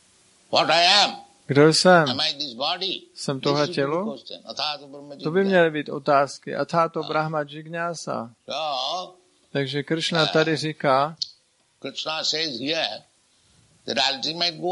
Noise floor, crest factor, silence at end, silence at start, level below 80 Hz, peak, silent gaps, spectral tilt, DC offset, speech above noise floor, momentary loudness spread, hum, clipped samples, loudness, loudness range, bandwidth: -62 dBFS; 22 dB; 0 s; 0.5 s; -72 dBFS; -2 dBFS; none; -4 dB/octave; under 0.1%; 39 dB; 15 LU; none; under 0.1%; -22 LUFS; 7 LU; 11.5 kHz